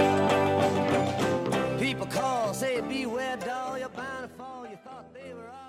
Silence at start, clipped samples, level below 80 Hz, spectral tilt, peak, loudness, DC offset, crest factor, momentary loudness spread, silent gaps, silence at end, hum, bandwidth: 0 s; under 0.1%; -60 dBFS; -5 dB/octave; -12 dBFS; -28 LUFS; under 0.1%; 18 dB; 19 LU; none; 0 s; none; 16 kHz